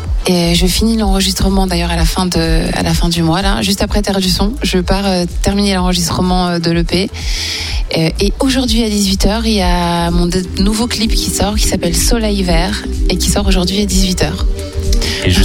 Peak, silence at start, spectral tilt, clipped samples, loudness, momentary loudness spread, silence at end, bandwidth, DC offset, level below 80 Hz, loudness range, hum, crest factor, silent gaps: 0 dBFS; 0 s; -4.5 dB/octave; under 0.1%; -14 LUFS; 4 LU; 0 s; 17.5 kHz; under 0.1%; -18 dBFS; 1 LU; none; 12 dB; none